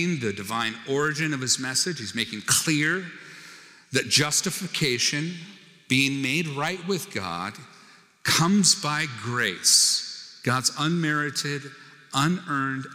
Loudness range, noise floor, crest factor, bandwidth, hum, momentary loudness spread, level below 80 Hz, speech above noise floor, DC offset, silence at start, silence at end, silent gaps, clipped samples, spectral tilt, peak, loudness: 4 LU; -53 dBFS; 20 dB; 19 kHz; none; 12 LU; -68 dBFS; 28 dB; under 0.1%; 0 s; 0 s; none; under 0.1%; -2.5 dB/octave; -6 dBFS; -23 LUFS